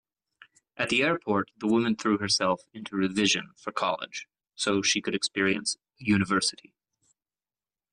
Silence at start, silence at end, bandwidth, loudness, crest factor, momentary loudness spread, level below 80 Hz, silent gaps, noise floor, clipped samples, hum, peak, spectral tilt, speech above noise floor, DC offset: 0.8 s; 1.4 s; 11 kHz; -27 LUFS; 16 dB; 9 LU; -66 dBFS; none; under -90 dBFS; under 0.1%; none; -12 dBFS; -3.5 dB/octave; over 63 dB; under 0.1%